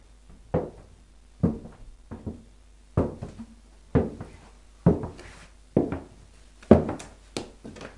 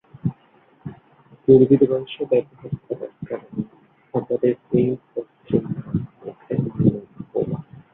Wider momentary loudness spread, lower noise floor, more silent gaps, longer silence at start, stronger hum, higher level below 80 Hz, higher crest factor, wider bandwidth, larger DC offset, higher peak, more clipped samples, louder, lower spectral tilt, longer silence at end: first, 25 LU vs 18 LU; about the same, -53 dBFS vs -56 dBFS; neither; about the same, 0.3 s vs 0.25 s; neither; first, -46 dBFS vs -54 dBFS; first, 28 dB vs 20 dB; first, 11.5 kHz vs 3.9 kHz; neither; about the same, 0 dBFS vs -2 dBFS; neither; second, -27 LUFS vs -22 LUFS; second, -8 dB/octave vs -12.5 dB/octave; second, 0.1 s vs 0.3 s